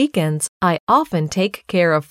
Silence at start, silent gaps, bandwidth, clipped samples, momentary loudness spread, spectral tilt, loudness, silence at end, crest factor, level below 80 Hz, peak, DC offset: 0 s; 0.49-0.60 s, 0.80-0.87 s; 16 kHz; under 0.1%; 5 LU; -5 dB/octave; -18 LUFS; 0.1 s; 16 dB; -56 dBFS; -2 dBFS; under 0.1%